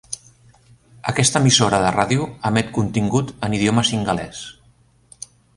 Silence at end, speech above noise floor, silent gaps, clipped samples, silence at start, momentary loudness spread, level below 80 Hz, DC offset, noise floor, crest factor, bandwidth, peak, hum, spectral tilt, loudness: 1.05 s; 37 dB; none; under 0.1%; 0.1 s; 20 LU; -48 dBFS; under 0.1%; -55 dBFS; 20 dB; 11.5 kHz; 0 dBFS; none; -4 dB/octave; -18 LUFS